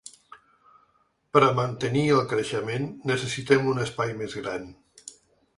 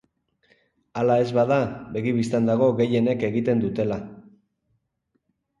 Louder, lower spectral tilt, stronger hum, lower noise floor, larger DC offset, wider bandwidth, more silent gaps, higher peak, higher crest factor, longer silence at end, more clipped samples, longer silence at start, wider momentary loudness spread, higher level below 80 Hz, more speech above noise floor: about the same, -25 LUFS vs -23 LUFS; second, -5.5 dB/octave vs -8 dB/octave; neither; second, -67 dBFS vs -74 dBFS; neither; about the same, 11.5 kHz vs 11 kHz; neither; first, -4 dBFS vs -8 dBFS; first, 24 dB vs 16 dB; second, 0.45 s vs 1.4 s; neither; second, 0.05 s vs 0.95 s; first, 24 LU vs 8 LU; about the same, -60 dBFS vs -58 dBFS; second, 42 dB vs 52 dB